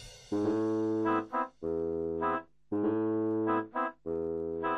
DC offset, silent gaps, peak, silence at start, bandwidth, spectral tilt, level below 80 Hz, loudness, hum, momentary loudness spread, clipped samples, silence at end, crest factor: under 0.1%; none; -18 dBFS; 0 s; 9.8 kHz; -7.5 dB/octave; -60 dBFS; -33 LUFS; none; 5 LU; under 0.1%; 0 s; 14 dB